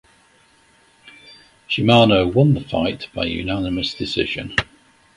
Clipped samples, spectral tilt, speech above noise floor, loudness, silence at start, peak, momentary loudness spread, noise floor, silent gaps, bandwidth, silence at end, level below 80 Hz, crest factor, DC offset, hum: under 0.1%; -6.5 dB/octave; 37 dB; -19 LUFS; 1.05 s; 0 dBFS; 11 LU; -55 dBFS; none; 11.5 kHz; 0.5 s; -42 dBFS; 20 dB; under 0.1%; none